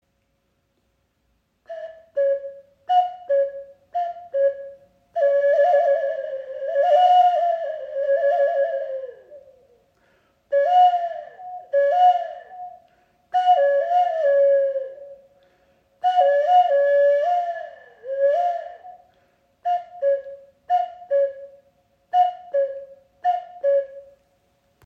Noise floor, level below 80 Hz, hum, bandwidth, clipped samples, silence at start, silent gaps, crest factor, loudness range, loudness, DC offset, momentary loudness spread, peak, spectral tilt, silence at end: -69 dBFS; -74 dBFS; none; 6.2 kHz; under 0.1%; 1.7 s; none; 14 dB; 6 LU; -21 LUFS; under 0.1%; 20 LU; -8 dBFS; -2 dB/octave; 0.85 s